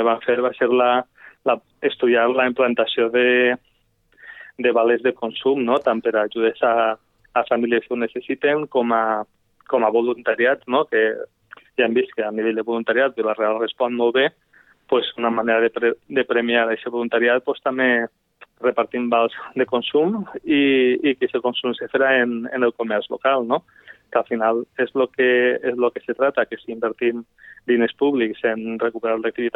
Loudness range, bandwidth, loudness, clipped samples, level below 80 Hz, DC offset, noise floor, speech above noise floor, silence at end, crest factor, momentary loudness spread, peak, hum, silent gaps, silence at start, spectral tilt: 2 LU; 4.1 kHz; -20 LUFS; under 0.1%; -68 dBFS; under 0.1%; -62 dBFS; 43 dB; 0.05 s; 16 dB; 7 LU; -4 dBFS; none; none; 0 s; -7.5 dB/octave